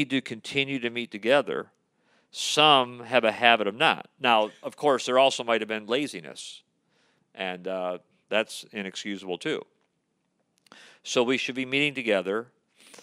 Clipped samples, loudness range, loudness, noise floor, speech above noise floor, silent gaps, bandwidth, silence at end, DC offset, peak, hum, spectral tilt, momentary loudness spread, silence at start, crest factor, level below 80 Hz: under 0.1%; 10 LU; -25 LUFS; -75 dBFS; 49 dB; none; 15.5 kHz; 0.6 s; under 0.1%; -2 dBFS; none; -3 dB/octave; 14 LU; 0 s; 26 dB; -82 dBFS